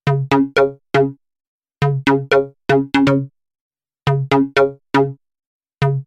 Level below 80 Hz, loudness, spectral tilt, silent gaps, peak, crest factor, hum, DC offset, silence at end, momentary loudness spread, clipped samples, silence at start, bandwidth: -48 dBFS; -17 LUFS; -7.5 dB/octave; 1.47-1.60 s, 3.61-3.70 s, 5.47-5.60 s; 0 dBFS; 16 dB; none; under 0.1%; 0.05 s; 7 LU; under 0.1%; 0.05 s; 9.6 kHz